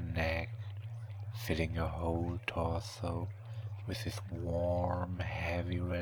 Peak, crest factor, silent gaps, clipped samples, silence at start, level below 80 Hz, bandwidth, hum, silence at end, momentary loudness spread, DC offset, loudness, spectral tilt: -18 dBFS; 18 dB; none; under 0.1%; 0 s; -48 dBFS; 19.5 kHz; none; 0 s; 10 LU; under 0.1%; -38 LUFS; -6.5 dB/octave